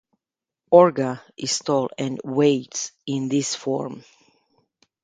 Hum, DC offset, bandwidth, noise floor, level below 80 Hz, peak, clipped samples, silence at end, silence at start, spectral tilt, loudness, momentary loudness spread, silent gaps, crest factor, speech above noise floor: none; under 0.1%; 9.4 kHz; -89 dBFS; -68 dBFS; 0 dBFS; under 0.1%; 1.05 s; 0.7 s; -4.5 dB/octave; -22 LUFS; 14 LU; none; 22 dB; 67 dB